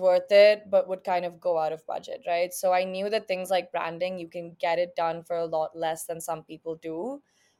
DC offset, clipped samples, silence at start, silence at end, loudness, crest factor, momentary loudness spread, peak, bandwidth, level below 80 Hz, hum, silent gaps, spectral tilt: under 0.1%; under 0.1%; 0 s; 0.4 s; -27 LUFS; 20 dB; 16 LU; -8 dBFS; 16 kHz; -76 dBFS; none; none; -3.5 dB/octave